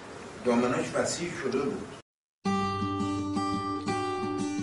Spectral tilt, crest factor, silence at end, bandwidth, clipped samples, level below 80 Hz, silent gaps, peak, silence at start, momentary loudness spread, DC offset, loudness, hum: -5 dB/octave; 16 dB; 0 s; 11.5 kHz; under 0.1%; -60 dBFS; 2.02-2.42 s; -14 dBFS; 0 s; 9 LU; under 0.1%; -30 LUFS; none